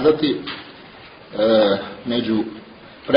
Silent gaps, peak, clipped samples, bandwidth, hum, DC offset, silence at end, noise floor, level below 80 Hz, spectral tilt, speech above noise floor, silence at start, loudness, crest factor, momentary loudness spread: none; 0 dBFS; under 0.1%; 5.4 kHz; none; under 0.1%; 0 s; -42 dBFS; -56 dBFS; -9 dB/octave; 23 dB; 0 s; -20 LUFS; 20 dB; 24 LU